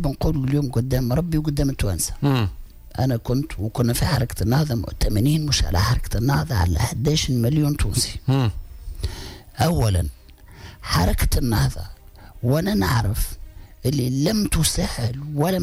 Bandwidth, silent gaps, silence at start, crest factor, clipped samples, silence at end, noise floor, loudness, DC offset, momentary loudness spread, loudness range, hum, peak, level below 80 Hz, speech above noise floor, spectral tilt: 16 kHz; none; 0 s; 12 dB; under 0.1%; 0 s; -42 dBFS; -22 LUFS; under 0.1%; 11 LU; 3 LU; none; -10 dBFS; -30 dBFS; 22 dB; -5.5 dB/octave